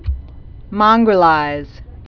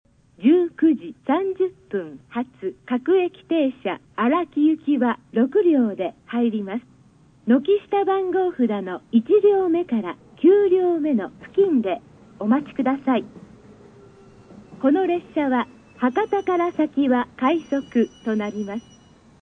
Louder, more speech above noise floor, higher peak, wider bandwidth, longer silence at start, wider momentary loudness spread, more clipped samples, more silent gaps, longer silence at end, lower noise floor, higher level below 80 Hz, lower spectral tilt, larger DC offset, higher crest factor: first, -13 LUFS vs -21 LUFS; second, 21 dB vs 33 dB; first, 0 dBFS vs -6 dBFS; second, 5.4 kHz vs 6.2 kHz; second, 0.05 s vs 0.4 s; first, 18 LU vs 12 LU; neither; neither; second, 0.1 s vs 0.6 s; second, -34 dBFS vs -53 dBFS; first, -30 dBFS vs -64 dBFS; about the same, -7.5 dB/octave vs -7.5 dB/octave; neither; about the same, 16 dB vs 16 dB